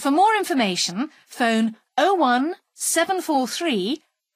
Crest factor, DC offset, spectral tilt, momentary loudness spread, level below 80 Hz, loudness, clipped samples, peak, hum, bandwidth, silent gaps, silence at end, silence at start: 16 dB; under 0.1%; -3 dB/octave; 10 LU; -76 dBFS; -21 LUFS; under 0.1%; -6 dBFS; none; 15.5 kHz; none; 0.4 s; 0 s